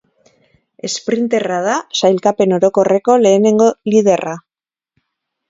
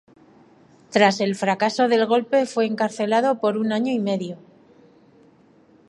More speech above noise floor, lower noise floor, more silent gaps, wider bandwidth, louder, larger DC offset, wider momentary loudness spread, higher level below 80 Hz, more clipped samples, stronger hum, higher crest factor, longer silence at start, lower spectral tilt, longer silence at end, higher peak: first, over 77 dB vs 34 dB; first, under -90 dBFS vs -54 dBFS; neither; second, 7.8 kHz vs 11.5 kHz; first, -14 LUFS vs -21 LUFS; neither; first, 11 LU vs 7 LU; first, -60 dBFS vs -74 dBFS; neither; neither; second, 14 dB vs 22 dB; about the same, 0.85 s vs 0.9 s; about the same, -5 dB/octave vs -5 dB/octave; second, 1.1 s vs 1.55 s; about the same, 0 dBFS vs 0 dBFS